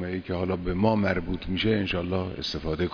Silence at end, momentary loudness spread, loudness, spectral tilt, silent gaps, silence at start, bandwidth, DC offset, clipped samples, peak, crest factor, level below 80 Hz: 0 s; 7 LU; -27 LUFS; -7 dB/octave; none; 0 s; 5.4 kHz; under 0.1%; under 0.1%; -10 dBFS; 18 dB; -42 dBFS